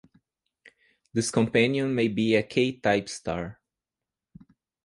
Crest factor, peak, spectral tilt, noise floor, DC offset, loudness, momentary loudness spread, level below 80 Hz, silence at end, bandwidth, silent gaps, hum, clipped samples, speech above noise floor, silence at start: 20 dB; -8 dBFS; -5 dB/octave; -89 dBFS; under 0.1%; -25 LUFS; 10 LU; -58 dBFS; 1.35 s; 11.5 kHz; none; none; under 0.1%; 65 dB; 0.65 s